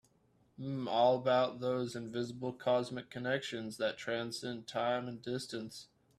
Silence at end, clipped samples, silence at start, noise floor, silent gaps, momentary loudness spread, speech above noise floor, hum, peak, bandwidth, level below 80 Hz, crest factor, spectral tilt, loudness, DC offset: 0.35 s; under 0.1%; 0.6 s; -71 dBFS; none; 12 LU; 36 dB; none; -18 dBFS; 13.5 kHz; -74 dBFS; 18 dB; -5 dB/octave; -36 LUFS; under 0.1%